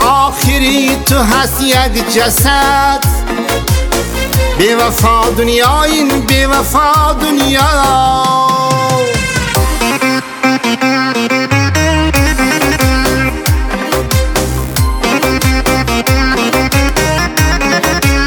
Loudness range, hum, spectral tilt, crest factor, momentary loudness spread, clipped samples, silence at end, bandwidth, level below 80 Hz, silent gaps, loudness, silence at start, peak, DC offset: 3 LU; none; -4 dB/octave; 10 dB; 4 LU; under 0.1%; 0 s; over 20 kHz; -18 dBFS; none; -11 LUFS; 0 s; 0 dBFS; under 0.1%